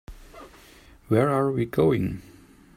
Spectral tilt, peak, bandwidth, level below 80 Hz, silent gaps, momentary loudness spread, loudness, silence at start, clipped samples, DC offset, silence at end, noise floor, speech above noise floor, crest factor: -8 dB/octave; -8 dBFS; 15.5 kHz; -50 dBFS; none; 8 LU; -24 LUFS; 0.1 s; under 0.1%; under 0.1%; 0.55 s; -51 dBFS; 29 dB; 20 dB